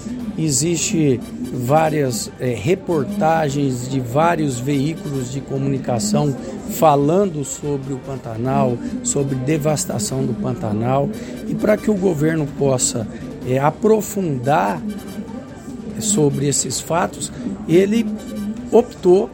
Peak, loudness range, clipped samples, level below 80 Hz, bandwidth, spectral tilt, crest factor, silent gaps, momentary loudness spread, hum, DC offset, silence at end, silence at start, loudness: 0 dBFS; 2 LU; under 0.1%; -46 dBFS; 17 kHz; -5.5 dB/octave; 18 dB; none; 11 LU; none; under 0.1%; 0 s; 0 s; -19 LUFS